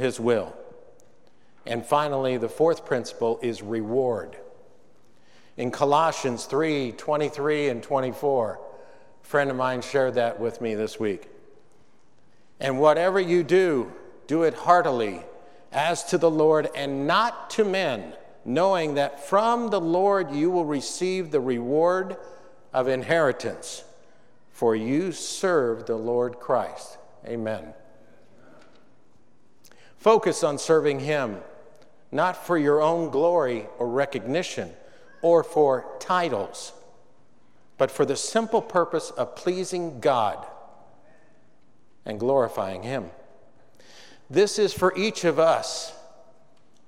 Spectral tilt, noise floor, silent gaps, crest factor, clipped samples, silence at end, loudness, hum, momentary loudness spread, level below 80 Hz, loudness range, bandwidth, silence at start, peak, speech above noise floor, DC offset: -5 dB/octave; -63 dBFS; none; 20 dB; under 0.1%; 0.85 s; -24 LUFS; none; 12 LU; -70 dBFS; 5 LU; 15 kHz; 0 s; -4 dBFS; 39 dB; 0.4%